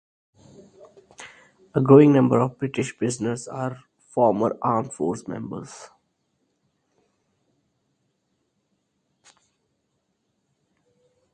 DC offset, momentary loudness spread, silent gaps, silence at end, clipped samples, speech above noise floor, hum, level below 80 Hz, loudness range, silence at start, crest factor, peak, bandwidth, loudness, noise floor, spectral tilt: under 0.1%; 28 LU; none; 5.5 s; under 0.1%; 53 dB; none; -64 dBFS; 15 LU; 1.2 s; 24 dB; 0 dBFS; 9.8 kHz; -21 LUFS; -74 dBFS; -7.5 dB/octave